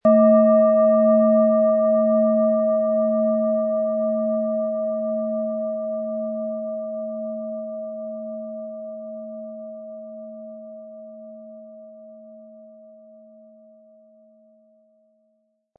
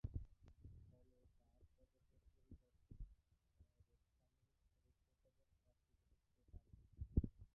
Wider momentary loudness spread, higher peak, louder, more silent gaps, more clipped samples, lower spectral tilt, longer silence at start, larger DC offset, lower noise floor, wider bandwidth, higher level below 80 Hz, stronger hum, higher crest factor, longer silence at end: about the same, 23 LU vs 23 LU; first, -6 dBFS vs -24 dBFS; first, -20 LUFS vs -50 LUFS; neither; neither; second, -13 dB/octave vs -14.5 dB/octave; about the same, 0.05 s vs 0.05 s; neither; second, -69 dBFS vs -83 dBFS; first, 2.8 kHz vs 2.1 kHz; second, -78 dBFS vs -58 dBFS; neither; second, 16 dB vs 30 dB; first, 3.1 s vs 0.1 s